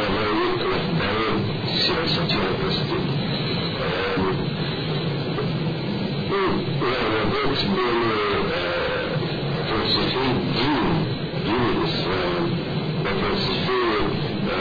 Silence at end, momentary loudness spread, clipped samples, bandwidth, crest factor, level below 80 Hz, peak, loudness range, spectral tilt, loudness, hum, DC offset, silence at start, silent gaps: 0 s; 4 LU; under 0.1%; 5 kHz; 12 dB; -42 dBFS; -10 dBFS; 2 LU; -7 dB/octave; -23 LUFS; none; 0.1%; 0 s; none